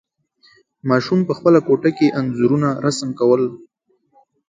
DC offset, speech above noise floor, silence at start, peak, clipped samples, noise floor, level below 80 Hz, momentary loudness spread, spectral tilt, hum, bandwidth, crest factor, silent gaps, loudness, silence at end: under 0.1%; 41 dB; 0.85 s; -2 dBFS; under 0.1%; -57 dBFS; -60 dBFS; 6 LU; -6.5 dB/octave; none; 9.4 kHz; 18 dB; none; -17 LUFS; 0.95 s